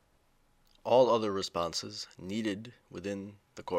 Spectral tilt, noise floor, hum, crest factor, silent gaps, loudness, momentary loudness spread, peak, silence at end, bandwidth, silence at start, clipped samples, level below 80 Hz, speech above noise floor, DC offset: -4.5 dB/octave; -69 dBFS; none; 20 dB; none; -32 LUFS; 19 LU; -12 dBFS; 0 s; 14.5 kHz; 0.85 s; under 0.1%; -68 dBFS; 37 dB; under 0.1%